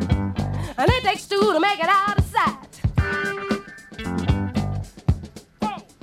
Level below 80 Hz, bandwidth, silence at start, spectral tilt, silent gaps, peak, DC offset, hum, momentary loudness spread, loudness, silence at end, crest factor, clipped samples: -34 dBFS; 15.5 kHz; 0 s; -6 dB/octave; none; -2 dBFS; under 0.1%; none; 11 LU; -23 LUFS; 0.2 s; 20 dB; under 0.1%